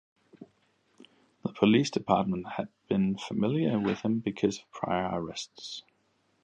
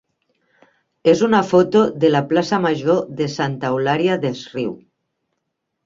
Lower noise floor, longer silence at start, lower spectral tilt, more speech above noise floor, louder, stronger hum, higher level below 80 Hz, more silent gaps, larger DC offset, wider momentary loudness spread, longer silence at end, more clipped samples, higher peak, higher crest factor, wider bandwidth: second, -71 dBFS vs -76 dBFS; second, 0.4 s vs 1.05 s; about the same, -6 dB/octave vs -6.5 dB/octave; second, 43 dB vs 59 dB; second, -30 LUFS vs -18 LUFS; neither; about the same, -62 dBFS vs -60 dBFS; neither; neither; first, 14 LU vs 11 LU; second, 0.65 s vs 1.1 s; neither; second, -8 dBFS vs -2 dBFS; about the same, 22 dB vs 18 dB; first, 9 kHz vs 7.6 kHz